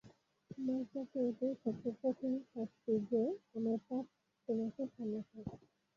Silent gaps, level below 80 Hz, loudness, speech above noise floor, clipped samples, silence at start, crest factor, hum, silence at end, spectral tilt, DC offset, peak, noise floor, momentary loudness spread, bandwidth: none; -76 dBFS; -40 LUFS; 19 dB; under 0.1%; 0.05 s; 16 dB; none; 0.4 s; -9.5 dB/octave; under 0.1%; -24 dBFS; -58 dBFS; 13 LU; 7 kHz